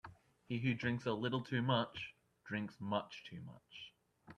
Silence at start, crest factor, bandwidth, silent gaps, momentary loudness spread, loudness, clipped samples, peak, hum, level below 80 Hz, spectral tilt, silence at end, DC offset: 0.05 s; 22 dB; 8.8 kHz; none; 17 LU; -40 LUFS; under 0.1%; -20 dBFS; none; -74 dBFS; -7 dB/octave; 0.05 s; under 0.1%